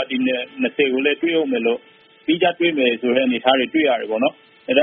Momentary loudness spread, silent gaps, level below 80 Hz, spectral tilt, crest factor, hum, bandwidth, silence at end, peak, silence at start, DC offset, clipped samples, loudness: 6 LU; none; -66 dBFS; -1.5 dB/octave; 20 dB; none; 3.9 kHz; 0 s; 0 dBFS; 0 s; under 0.1%; under 0.1%; -19 LUFS